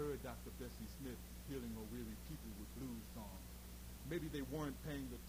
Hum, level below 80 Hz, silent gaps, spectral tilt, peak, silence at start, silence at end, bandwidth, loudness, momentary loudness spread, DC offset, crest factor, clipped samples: none; -56 dBFS; none; -5.5 dB/octave; -32 dBFS; 0 s; 0 s; over 20 kHz; -50 LUFS; 8 LU; under 0.1%; 16 dB; under 0.1%